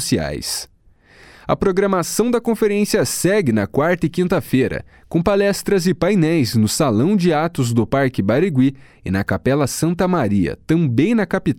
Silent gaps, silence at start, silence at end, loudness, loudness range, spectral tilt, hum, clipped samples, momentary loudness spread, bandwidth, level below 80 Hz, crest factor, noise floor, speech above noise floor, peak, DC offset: none; 0 s; 0.05 s; -18 LUFS; 2 LU; -5.5 dB/octave; none; under 0.1%; 6 LU; 18 kHz; -42 dBFS; 14 dB; -50 dBFS; 33 dB; -2 dBFS; under 0.1%